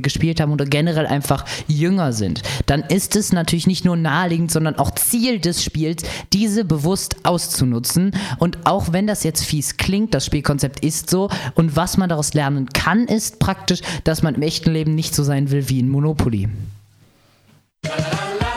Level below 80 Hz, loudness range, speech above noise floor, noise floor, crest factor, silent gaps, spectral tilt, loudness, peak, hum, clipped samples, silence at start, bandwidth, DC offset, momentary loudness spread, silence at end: -38 dBFS; 1 LU; 36 dB; -55 dBFS; 18 dB; none; -5 dB/octave; -19 LUFS; 0 dBFS; none; under 0.1%; 0 s; 16 kHz; under 0.1%; 4 LU; 0 s